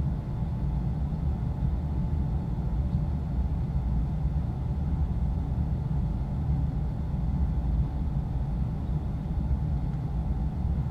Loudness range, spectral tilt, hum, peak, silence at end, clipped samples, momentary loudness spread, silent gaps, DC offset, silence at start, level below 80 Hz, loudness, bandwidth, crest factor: 1 LU; -10.5 dB/octave; none; -16 dBFS; 0 s; under 0.1%; 2 LU; none; under 0.1%; 0 s; -30 dBFS; -30 LUFS; 4.8 kHz; 12 dB